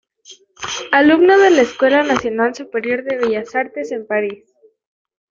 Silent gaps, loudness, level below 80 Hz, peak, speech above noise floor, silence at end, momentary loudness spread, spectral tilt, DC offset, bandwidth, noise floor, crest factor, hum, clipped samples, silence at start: none; -15 LUFS; -58 dBFS; 0 dBFS; 30 dB; 0.95 s; 15 LU; -3.5 dB/octave; under 0.1%; 7.6 kHz; -45 dBFS; 16 dB; none; under 0.1%; 0.3 s